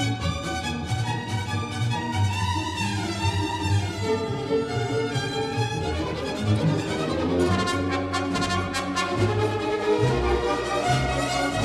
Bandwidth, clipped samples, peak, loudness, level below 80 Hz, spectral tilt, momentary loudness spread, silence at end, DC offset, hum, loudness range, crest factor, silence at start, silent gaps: 13.5 kHz; under 0.1%; -10 dBFS; -25 LUFS; -40 dBFS; -5.5 dB/octave; 5 LU; 0 s; under 0.1%; none; 2 LU; 16 dB; 0 s; none